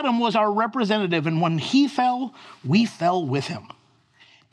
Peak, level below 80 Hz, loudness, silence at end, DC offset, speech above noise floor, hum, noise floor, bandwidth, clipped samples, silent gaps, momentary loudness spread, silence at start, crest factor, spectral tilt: -8 dBFS; -78 dBFS; -22 LUFS; 0.85 s; under 0.1%; 35 dB; none; -57 dBFS; 11 kHz; under 0.1%; none; 11 LU; 0 s; 16 dB; -6 dB/octave